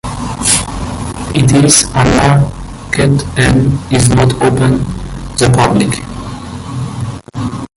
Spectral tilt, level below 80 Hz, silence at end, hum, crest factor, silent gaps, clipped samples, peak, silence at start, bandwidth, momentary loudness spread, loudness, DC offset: -4.5 dB/octave; -28 dBFS; 0.1 s; none; 12 dB; none; under 0.1%; 0 dBFS; 0.05 s; 16 kHz; 14 LU; -11 LUFS; under 0.1%